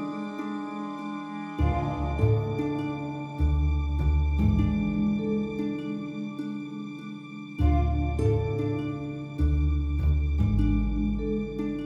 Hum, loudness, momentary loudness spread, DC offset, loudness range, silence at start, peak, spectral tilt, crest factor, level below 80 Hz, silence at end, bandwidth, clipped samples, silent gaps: none; -28 LUFS; 10 LU; under 0.1%; 3 LU; 0 s; -10 dBFS; -9 dB/octave; 16 dB; -30 dBFS; 0 s; 6.2 kHz; under 0.1%; none